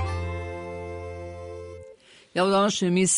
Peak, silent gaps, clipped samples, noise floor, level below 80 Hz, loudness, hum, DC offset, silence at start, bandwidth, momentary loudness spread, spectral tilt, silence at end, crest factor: -10 dBFS; none; under 0.1%; -51 dBFS; -48 dBFS; -27 LUFS; none; under 0.1%; 0 s; 11 kHz; 19 LU; -4 dB/octave; 0 s; 16 dB